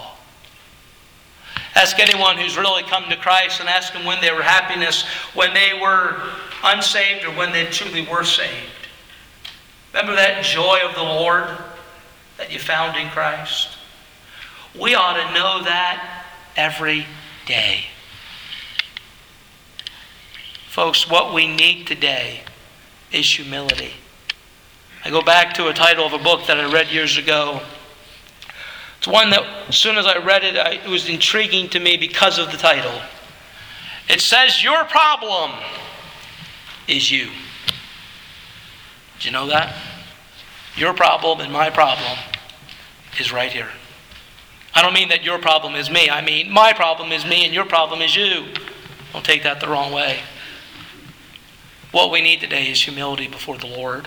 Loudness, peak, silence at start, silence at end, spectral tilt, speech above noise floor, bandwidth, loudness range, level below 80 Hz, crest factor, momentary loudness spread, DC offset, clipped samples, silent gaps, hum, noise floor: -16 LUFS; 0 dBFS; 0 s; 0 s; -2 dB/octave; 30 dB; over 20 kHz; 7 LU; -54 dBFS; 20 dB; 21 LU; under 0.1%; under 0.1%; none; none; -47 dBFS